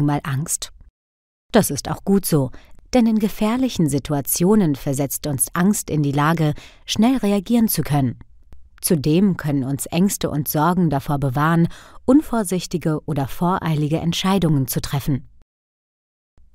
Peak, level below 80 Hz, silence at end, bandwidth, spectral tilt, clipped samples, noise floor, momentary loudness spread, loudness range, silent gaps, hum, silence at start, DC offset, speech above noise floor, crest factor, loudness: 0 dBFS; -42 dBFS; 1.3 s; 16 kHz; -5.5 dB/octave; under 0.1%; -42 dBFS; 6 LU; 2 LU; 0.90-1.49 s; none; 0 s; under 0.1%; 23 dB; 20 dB; -20 LUFS